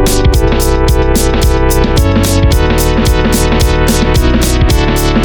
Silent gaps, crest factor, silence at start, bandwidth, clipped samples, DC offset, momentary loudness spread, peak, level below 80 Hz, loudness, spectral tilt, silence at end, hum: none; 8 dB; 0 s; 18.5 kHz; under 0.1%; under 0.1%; 1 LU; 0 dBFS; -12 dBFS; -10 LUFS; -5 dB/octave; 0 s; none